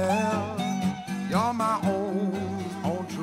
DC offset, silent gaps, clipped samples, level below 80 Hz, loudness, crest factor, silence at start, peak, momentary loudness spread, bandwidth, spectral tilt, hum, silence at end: under 0.1%; none; under 0.1%; -60 dBFS; -28 LUFS; 16 dB; 0 s; -10 dBFS; 6 LU; 15.5 kHz; -6 dB/octave; none; 0 s